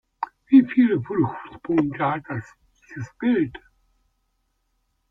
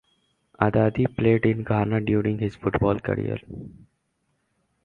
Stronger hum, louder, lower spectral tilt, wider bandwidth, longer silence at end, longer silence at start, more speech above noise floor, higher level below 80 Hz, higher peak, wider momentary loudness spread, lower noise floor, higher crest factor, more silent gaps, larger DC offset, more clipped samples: neither; first, -21 LUFS vs -24 LUFS; about the same, -9 dB/octave vs -10 dB/octave; first, 5.8 kHz vs 4.6 kHz; first, 1.55 s vs 1.15 s; second, 0.2 s vs 0.6 s; about the same, 49 dB vs 50 dB; second, -60 dBFS vs -46 dBFS; about the same, -4 dBFS vs -2 dBFS; first, 19 LU vs 10 LU; about the same, -71 dBFS vs -73 dBFS; about the same, 20 dB vs 22 dB; neither; neither; neither